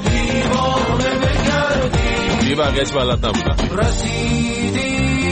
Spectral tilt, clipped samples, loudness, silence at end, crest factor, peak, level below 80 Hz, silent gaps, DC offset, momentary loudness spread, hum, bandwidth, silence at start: -5 dB/octave; under 0.1%; -17 LUFS; 0 s; 12 dB; -6 dBFS; -24 dBFS; none; under 0.1%; 2 LU; none; 8.8 kHz; 0 s